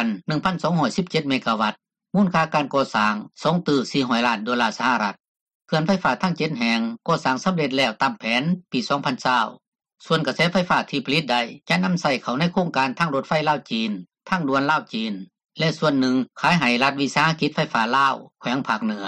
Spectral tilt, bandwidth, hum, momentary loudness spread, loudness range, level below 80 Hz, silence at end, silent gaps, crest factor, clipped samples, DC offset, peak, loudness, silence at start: -5.5 dB/octave; 11 kHz; none; 6 LU; 2 LU; -60 dBFS; 0 s; 5.28-5.35 s, 5.41-5.46 s, 5.55-5.60 s, 9.67-9.72 s; 16 dB; under 0.1%; under 0.1%; -6 dBFS; -22 LUFS; 0 s